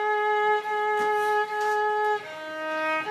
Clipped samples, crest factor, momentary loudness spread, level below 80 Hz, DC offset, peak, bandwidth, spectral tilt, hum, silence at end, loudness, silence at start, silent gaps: under 0.1%; 12 dB; 7 LU; -82 dBFS; under 0.1%; -14 dBFS; 15 kHz; -2.5 dB/octave; none; 0 s; -25 LUFS; 0 s; none